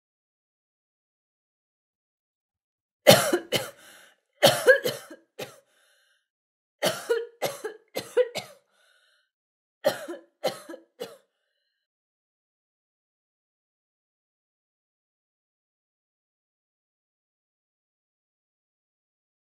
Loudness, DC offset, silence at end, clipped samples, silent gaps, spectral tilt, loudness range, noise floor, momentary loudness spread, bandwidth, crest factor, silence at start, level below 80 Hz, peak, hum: -24 LUFS; under 0.1%; 8.45 s; under 0.1%; 6.30-6.79 s, 9.34-9.81 s; -3 dB/octave; 13 LU; -78 dBFS; 23 LU; 16 kHz; 30 dB; 3.05 s; -70 dBFS; -2 dBFS; none